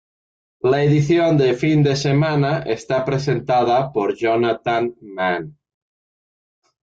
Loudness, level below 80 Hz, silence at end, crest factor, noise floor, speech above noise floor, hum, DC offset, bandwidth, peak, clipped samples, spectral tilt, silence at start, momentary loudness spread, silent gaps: -18 LUFS; -54 dBFS; 1.35 s; 14 dB; under -90 dBFS; over 72 dB; none; under 0.1%; 7.8 kHz; -6 dBFS; under 0.1%; -7 dB/octave; 0.65 s; 7 LU; none